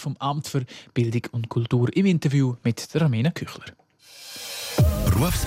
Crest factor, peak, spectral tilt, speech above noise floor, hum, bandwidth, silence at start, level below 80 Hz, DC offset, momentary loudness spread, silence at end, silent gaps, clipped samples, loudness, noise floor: 14 dB; -10 dBFS; -6 dB/octave; 23 dB; none; 16 kHz; 0 s; -38 dBFS; under 0.1%; 15 LU; 0 s; none; under 0.1%; -24 LUFS; -46 dBFS